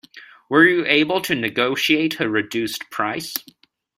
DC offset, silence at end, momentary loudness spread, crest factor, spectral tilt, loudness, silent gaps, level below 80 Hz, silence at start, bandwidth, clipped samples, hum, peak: under 0.1%; 0.55 s; 11 LU; 20 dB; -4 dB/octave; -19 LUFS; none; -62 dBFS; 0.15 s; 16 kHz; under 0.1%; none; -2 dBFS